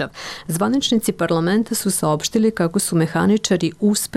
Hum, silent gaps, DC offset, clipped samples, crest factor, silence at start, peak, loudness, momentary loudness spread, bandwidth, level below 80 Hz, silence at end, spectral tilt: none; none; under 0.1%; under 0.1%; 12 dB; 0 s; -8 dBFS; -19 LUFS; 3 LU; 16 kHz; -52 dBFS; 0 s; -4.5 dB/octave